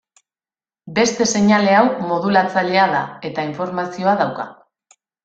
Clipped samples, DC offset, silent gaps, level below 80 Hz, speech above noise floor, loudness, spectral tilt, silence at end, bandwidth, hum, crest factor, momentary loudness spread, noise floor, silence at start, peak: under 0.1%; under 0.1%; none; -60 dBFS; over 73 dB; -17 LUFS; -4.5 dB/octave; 0.75 s; 8.8 kHz; none; 18 dB; 11 LU; under -90 dBFS; 0.85 s; -2 dBFS